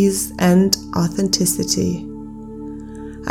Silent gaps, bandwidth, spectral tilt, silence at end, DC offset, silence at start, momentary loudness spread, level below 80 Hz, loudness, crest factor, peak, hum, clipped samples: none; 17.5 kHz; -4.5 dB/octave; 0 s; under 0.1%; 0 s; 18 LU; -42 dBFS; -17 LUFS; 20 dB; 0 dBFS; none; under 0.1%